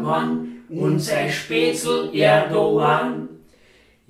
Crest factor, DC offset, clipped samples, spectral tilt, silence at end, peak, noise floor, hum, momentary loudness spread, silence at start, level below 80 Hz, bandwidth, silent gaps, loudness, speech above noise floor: 18 dB; under 0.1%; under 0.1%; -5 dB/octave; 0.75 s; -2 dBFS; -54 dBFS; none; 12 LU; 0 s; -62 dBFS; 15.5 kHz; none; -20 LUFS; 35 dB